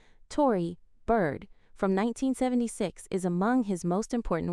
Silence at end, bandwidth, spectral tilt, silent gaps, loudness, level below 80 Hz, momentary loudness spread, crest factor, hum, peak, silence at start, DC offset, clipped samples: 0 s; 13.5 kHz; -6.5 dB/octave; none; -29 LUFS; -48 dBFS; 8 LU; 16 dB; none; -12 dBFS; 0.3 s; under 0.1%; under 0.1%